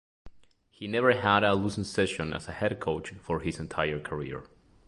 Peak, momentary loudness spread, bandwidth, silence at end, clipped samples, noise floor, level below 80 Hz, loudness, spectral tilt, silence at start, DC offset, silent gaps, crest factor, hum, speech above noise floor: -8 dBFS; 12 LU; 11.5 kHz; 0.4 s; under 0.1%; -59 dBFS; -52 dBFS; -29 LUFS; -5.5 dB/octave; 0.25 s; under 0.1%; none; 22 dB; none; 30 dB